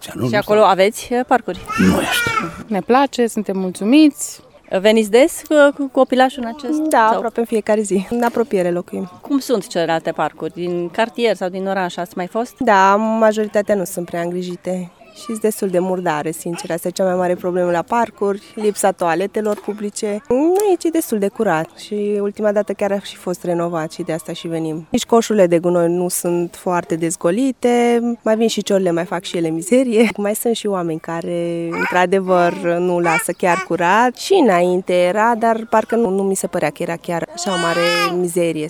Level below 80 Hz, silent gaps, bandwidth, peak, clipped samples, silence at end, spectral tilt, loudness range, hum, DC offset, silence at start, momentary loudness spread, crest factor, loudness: -54 dBFS; none; 19.5 kHz; 0 dBFS; under 0.1%; 0 s; -5 dB/octave; 5 LU; none; under 0.1%; 0 s; 10 LU; 16 dB; -17 LUFS